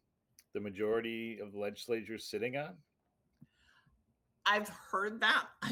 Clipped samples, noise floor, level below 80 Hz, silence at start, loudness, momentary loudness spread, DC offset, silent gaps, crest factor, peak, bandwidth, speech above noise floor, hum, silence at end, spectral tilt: under 0.1%; -80 dBFS; -78 dBFS; 0.55 s; -36 LUFS; 13 LU; under 0.1%; none; 22 dB; -16 dBFS; 18 kHz; 44 dB; none; 0 s; -3.5 dB/octave